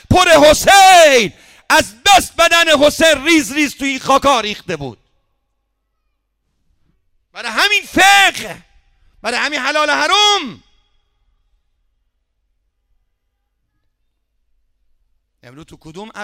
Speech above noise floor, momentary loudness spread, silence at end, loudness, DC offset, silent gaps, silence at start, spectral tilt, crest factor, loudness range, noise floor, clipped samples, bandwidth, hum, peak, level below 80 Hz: 57 dB; 18 LU; 0 s; -11 LUFS; under 0.1%; none; 0.1 s; -2 dB/octave; 14 dB; 11 LU; -69 dBFS; under 0.1%; 18.5 kHz; none; -2 dBFS; -42 dBFS